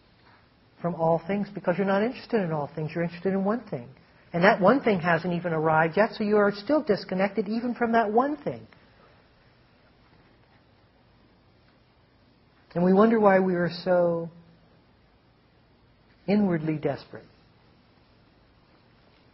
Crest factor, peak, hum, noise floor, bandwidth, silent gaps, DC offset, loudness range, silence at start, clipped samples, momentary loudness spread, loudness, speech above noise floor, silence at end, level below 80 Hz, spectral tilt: 24 dB; -4 dBFS; none; -61 dBFS; 5.8 kHz; none; under 0.1%; 8 LU; 0.8 s; under 0.1%; 14 LU; -25 LUFS; 36 dB; 2.15 s; -64 dBFS; -6 dB/octave